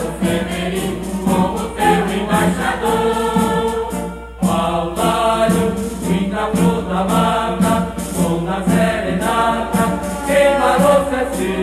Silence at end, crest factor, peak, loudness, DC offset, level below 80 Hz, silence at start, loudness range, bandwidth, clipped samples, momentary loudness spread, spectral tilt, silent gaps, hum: 0 s; 14 dB; -2 dBFS; -17 LUFS; under 0.1%; -34 dBFS; 0 s; 2 LU; 14.5 kHz; under 0.1%; 7 LU; -5.5 dB/octave; none; none